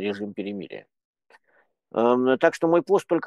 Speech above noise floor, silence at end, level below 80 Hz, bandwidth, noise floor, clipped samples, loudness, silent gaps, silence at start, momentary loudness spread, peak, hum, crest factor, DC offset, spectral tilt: 43 dB; 0 s; -72 dBFS; 12.5 kHz; -66 dBFS; under 0.1%; -23 LUFS; 1.05-1.13 s; 0 s; 16 LU; -4 dBFS; none; 22 dB; under 0.1%; -6 dB/octave